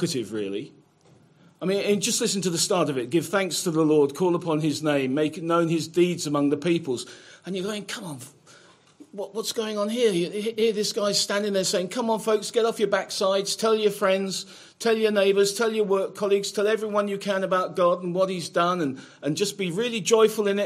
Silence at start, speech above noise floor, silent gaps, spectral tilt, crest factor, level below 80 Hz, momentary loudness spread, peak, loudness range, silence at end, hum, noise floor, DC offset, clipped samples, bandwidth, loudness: 0 s; 33 dB; none; -4 dB/octave; 18 dB; -74 dBFS; 11 LU; -6 dBFS; 5 LU; 0 s; none; -57 dBFS; under 0.1%; under 0.1%; 16 kHz; -24 LUFS